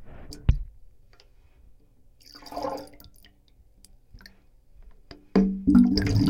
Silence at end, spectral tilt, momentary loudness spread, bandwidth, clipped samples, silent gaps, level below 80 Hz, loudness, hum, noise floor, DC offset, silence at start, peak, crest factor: 0 s; -7.5 dB/octave; 27 LU; 16 kHz; under 0.1%; none; -38 dBFS; -24 LUFS; none; -57 dBFS; under 0.1%; 0 s; -6 dBFS; 22 dB